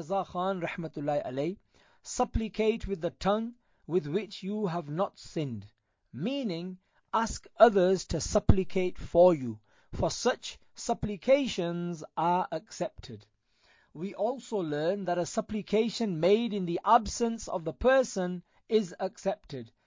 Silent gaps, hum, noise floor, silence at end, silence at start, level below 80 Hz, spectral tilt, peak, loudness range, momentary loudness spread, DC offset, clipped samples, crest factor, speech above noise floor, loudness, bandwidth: none; none; -67 dBFS; 0.2 s; 0 s; -46 dBFS; -5.5 dB/octave; -6 dBFS; 7 LU; 14 LU; under 0.1%; under 0.1%; 24 dB; 37 dB; -30 LUFS; 7.6 kHz